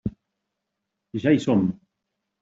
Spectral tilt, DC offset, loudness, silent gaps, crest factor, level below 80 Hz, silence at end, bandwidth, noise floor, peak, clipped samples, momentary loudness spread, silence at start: -7.5 dB/octave; under 0.1%; -22 LUFS; none; 20 dB; -54 dBFS; 0.65 s; 7.8 kHz; -82 dBFS; -8 dBFS; under 0.1%; 15 LU; 0.05 s